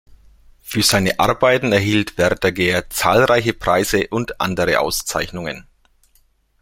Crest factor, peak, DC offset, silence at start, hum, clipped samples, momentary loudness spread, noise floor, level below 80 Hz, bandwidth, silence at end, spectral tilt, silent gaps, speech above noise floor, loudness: 18 dB; 0 dBFS; under 0.1%; 0.65 s; none; under 0.1%; 8 LU; -58 dBFS; -42 dBFS; 16.5 kHz; 1 s; -4 dB/octave; none; 41 dB; -17 LUFS